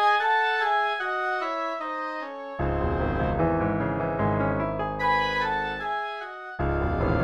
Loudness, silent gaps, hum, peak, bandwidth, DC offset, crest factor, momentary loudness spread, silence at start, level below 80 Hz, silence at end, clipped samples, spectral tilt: -26 LUFS; none; none; -12 dBFS; 11.5 kHz; under 0.1%; 14 dB; 8 LU; 0 s; -38 dBFS; 0 s; under 0.1%; -7 dB/octave